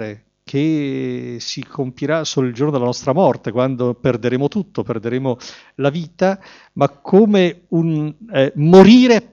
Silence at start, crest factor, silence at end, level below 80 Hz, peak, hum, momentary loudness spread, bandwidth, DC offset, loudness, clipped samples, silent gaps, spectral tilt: 0 s; 16 dB; 0.1 s; -52 dBFS; 0 dBFS; none; 15 LU; 7.4 kHz; under 0.1%; -16 LUFS; under 0.1%; none; -6.5 dB/octave